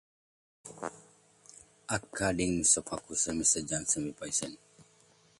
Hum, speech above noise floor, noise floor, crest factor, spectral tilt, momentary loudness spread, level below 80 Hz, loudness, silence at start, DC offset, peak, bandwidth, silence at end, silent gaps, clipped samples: none; 33 dB; -64 dBFS; 24 dB; -2.5 dB/octave; 17 LU; -58 dBFS; -30 LUFS; 0.65 s; under 0.1%; -12 dBFS; 11.5 kHz; 0.55 s; none; under 0.1%